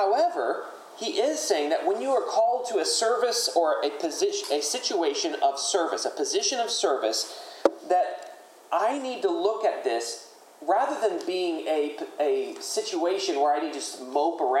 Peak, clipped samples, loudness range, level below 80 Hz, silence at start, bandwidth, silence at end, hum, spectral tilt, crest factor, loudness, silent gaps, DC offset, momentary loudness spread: -2 dBFS; under 0.1%; 3 LU; under -90 dBFS; 0 s; 16 kHz; 0 s; none; -0.5 dB/octave; 24 dB; -26 LUFS; none; under 0.1%; 7 LU